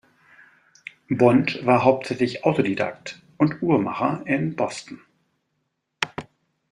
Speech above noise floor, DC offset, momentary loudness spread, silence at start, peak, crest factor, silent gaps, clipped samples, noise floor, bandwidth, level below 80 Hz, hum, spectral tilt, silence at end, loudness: 54 dB; under 0.1%; 20 LU; 1.1 s; -2 dBFS; 22 dB; none; under 0.1%; -75 dBFS; 11 kHz; -62 dBFS; none; -6.5 dB/octave; 0.5 s; -22 LUFS